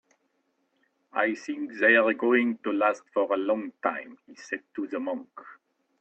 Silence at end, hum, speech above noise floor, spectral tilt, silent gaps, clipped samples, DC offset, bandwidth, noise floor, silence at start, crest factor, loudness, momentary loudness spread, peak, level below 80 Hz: 0.45 s; none; 47 dB; -5 dB/octave; none; under 0.1%; under 0.1%; 8.4 kHz; -74 dBFS; 1.15 s; 20 dB; -26 LUFS; 16 LU; -8 dBFS; -78 dBFS